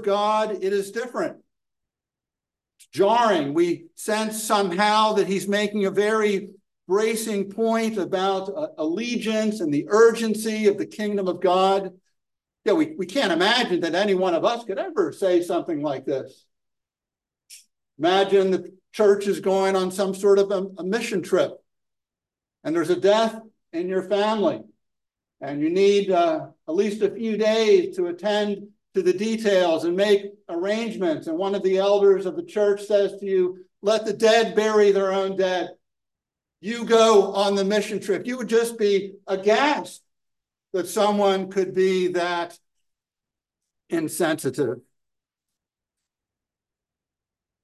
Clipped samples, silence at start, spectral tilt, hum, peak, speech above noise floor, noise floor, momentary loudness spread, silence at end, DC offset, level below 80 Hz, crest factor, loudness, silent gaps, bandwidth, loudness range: under 0.1%; 0 s; -4.5 dB/octave; none; -4 dBFS; 68 dB; -90 dBFS; 10 LU; 2.85 s; under 0.1%; -76 dBFS; 18 dB; -22 LUFS; none; 12.5 kHz; 5 LU